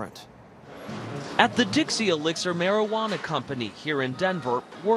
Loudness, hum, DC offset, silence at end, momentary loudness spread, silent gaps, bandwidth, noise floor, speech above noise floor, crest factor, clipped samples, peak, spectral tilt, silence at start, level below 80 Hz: -26 LUFS; none; under 0.1%; 0 s; 16 LU; none; 13 kHz; -46 dBFS; 20 dB; 26 dB; under 0.1%; 0 dBFS; -4 dB/octave; 0 s; -64 dBFS